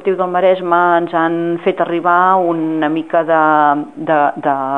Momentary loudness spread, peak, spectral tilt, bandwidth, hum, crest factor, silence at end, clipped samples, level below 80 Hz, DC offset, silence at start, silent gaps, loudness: 5 LU; 0 dBFS; -8 dB/octave; 4.2 kHz; none; 14 dB; 0 s; under 0.1%; -64 dBFS; 0.3%; 0 s; none; -14 LUFS